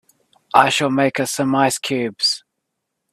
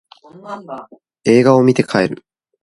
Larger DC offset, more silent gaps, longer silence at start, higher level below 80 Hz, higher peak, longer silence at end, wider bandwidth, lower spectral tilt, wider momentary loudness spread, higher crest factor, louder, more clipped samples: neither; neither; about the same, 0.55 s vs 0.45 s; second, -62 dBFS vs -56 dBFS; about the same, 0 dBFS vs 0 dBFS; first, 0.75 s vs 0.45 s; first, 14.5 kHz vs 11.5 kHz; second, -3.5 dB/octave vs -6.5 dB/octave; second, 6 LU vs 22 LU; about the same, 20 dB vs 16 dB; second, -18 LUFS vs -14 LUFS; neither